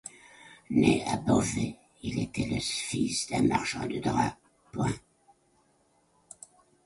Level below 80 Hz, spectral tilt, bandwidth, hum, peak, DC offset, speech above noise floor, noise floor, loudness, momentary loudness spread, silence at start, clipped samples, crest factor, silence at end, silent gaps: -54 dBFS; -5 dB/octave; 11.5 kHz; none; -10 dBFS; under 0.1%; 40 dB; -68 dBFS; -29 LUFS; 17 LU; 0.05 s; under 0.1%; 20 dB; 1.85 s; none